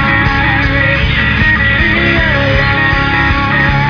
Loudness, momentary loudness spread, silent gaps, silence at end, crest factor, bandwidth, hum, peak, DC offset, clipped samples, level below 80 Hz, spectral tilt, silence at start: -10 LUFS; 2 LU; none; 0 s; 10 dB; 5.4 kHz; none; 0 dBFS; under 0.1%; under 0.1%; -20 dBFS; -6.5 dB/octave; 0 s